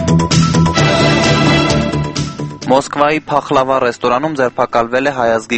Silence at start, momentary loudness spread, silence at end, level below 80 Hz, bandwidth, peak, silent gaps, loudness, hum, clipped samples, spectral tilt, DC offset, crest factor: 0 s; 6 LU; 0 s; -34 dBFS; 8.8 kHz; 0 dBFS; none; -13 LUFS; none; under 0.1%; -5 dB/octave; under 0.1%; 12 dB